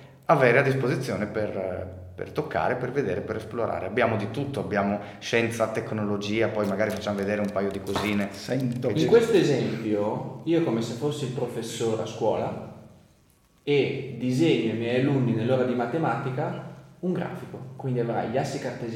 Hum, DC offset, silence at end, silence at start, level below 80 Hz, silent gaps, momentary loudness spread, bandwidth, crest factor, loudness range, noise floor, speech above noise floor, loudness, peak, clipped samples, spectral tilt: none; under 0.1%; 0 s; 0 s; -62 dBFS; none; 11 LU; 16.5 kHz; 22 dB; 4 LU; -61 dBFS; 35 dB; -26 LUFS; -4 dBFS; under 0.1%; -6.5 dB/octave